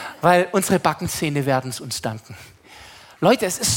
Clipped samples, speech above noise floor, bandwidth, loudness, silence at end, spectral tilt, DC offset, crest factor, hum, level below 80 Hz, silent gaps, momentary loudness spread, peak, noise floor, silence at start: under 0.1%; 24 dB; 17 kHz; -20 LUFS; 0 s; -4 dB/octave; under 0.1%; 20 dB; none; -54 dBFS; none; 14 LU; -2 dBFS; -44 dBFS; 0 s